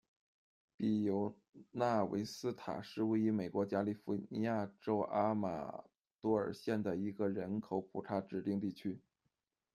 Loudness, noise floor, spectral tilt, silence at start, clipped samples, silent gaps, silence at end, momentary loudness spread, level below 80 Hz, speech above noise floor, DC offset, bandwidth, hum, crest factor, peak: -38 LUFS; -86 dBFS; -7.5 dB/octave; 0.8 s; under 0.1%; 1.49-1.53 s, 6.15-6.19 s; 0.75 s; 9 LU; -78 dBFS; 48 dB; under 0.1%; 13.5 kHz; none; 18 dB; -20 dBFS